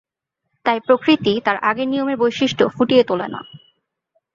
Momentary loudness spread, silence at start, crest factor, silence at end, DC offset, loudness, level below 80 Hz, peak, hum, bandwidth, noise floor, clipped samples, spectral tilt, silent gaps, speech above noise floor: 9 LU; 0.65 s; 18 dB; 0.75 s; under 0.1%; -18 LUFS; -60 dBFS; -2 dBFS; none; 7.4 kHz; -78 dBFS; under 0.1%; -5.5 dB/octave; none; 60 dB